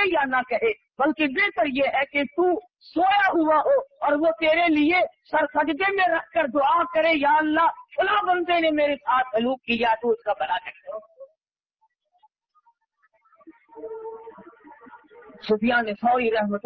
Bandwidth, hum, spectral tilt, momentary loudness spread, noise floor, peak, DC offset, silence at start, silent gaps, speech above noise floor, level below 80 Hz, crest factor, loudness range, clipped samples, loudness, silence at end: 6 kHz; none; -7 dB/octave; 11 LU; -80 dBFS; -10 dBFS; under 0.1%; 0 s; none; 58 dB; -60 dBFS; 14 dB; 9 LU; under 0.1%; -22 LUFS; 0.05 s